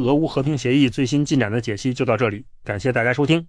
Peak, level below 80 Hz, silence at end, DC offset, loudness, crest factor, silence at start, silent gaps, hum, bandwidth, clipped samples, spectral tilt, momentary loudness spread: -6 dBFS; -48 dBFS; 0 s; under 0.1%; -20 LUFS; 14 dB; 0 s; none; none; 10.5 kHz; under 0.1%; -6 dB/octave; 7 LU